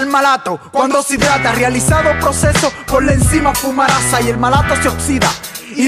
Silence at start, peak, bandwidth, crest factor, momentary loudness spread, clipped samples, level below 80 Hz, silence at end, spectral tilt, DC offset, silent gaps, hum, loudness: 0 s; 0 dBFS; 15.5 kHz; 12 dB; 4 LU; under 0.1%; -26 dBFS; 0 s; -4 dB/octave; under 0.1%; none; none; -13 LUFS